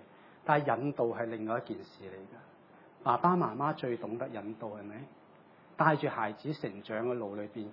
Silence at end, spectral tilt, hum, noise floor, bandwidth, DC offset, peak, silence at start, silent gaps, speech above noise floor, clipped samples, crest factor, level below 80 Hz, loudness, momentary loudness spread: 0 s; -9.5 dB/octave; none; -59 dBFS; 5.8 kHz; under 0.1%; -10 dBFS; 0 s; none; 26 dB; under 0.1%; 24 dB; -84 dBFS; -33 LUFS; 20 LU